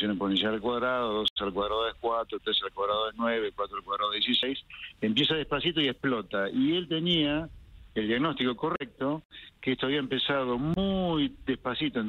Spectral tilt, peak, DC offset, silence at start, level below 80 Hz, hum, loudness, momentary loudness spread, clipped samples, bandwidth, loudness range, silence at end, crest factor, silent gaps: -6.5 dB/octave; -12 dBFS; under 0.1%; 0 s; -54 dBFS; none; -29 LUFS; 7 LU; under 0.1%; 11 kHz; 2 LU; 0 s; 16 dB; 1.30-1.36 s, 9.25-9.30 s